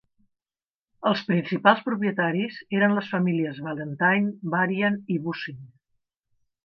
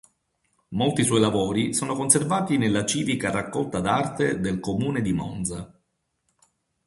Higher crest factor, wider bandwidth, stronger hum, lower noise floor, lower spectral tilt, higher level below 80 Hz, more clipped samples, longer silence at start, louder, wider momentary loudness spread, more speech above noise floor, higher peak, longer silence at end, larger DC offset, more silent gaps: about the same, 22 dB vs 24 dB; second, 6 kHz vs 12 kHz; neither; first, under -90 dBFS vs -74 dBFS; first, -8.5 dB/octave vs -4.5 dB/octave; second, -74 dBFS vs -52 dBFS; neither; first, 1 s vs 0.7 s; about the same, -24 LUFS vs -24 LUFS; first, 11 LU vs 8 LU; first, over 66 dB vs 51 dB; about the same, -2 dBFS vs -2 dBFS; second, 1 s vs 1.2 s; neither; neither